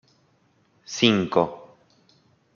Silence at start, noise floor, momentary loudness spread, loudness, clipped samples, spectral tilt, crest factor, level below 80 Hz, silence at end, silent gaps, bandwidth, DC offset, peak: 0.9 s; -64 dBFS; 17 LU; -22 LUFS; under 0.1%; -4.5 dB/octave; 24 dB; -68 dBFS; 0.9 s; none; 7.2 kHz; under 0.1%; -2 dBFS